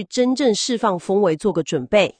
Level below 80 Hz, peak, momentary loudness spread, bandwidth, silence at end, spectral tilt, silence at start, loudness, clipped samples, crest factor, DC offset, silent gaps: -56 dBFS; -4 dBFS; 4 LU; 10 kHz; 0.1 s; -4.5 dB/octave; 0 s; -19 LUFS; under 0.1%; 16 dB; under 0.1%; none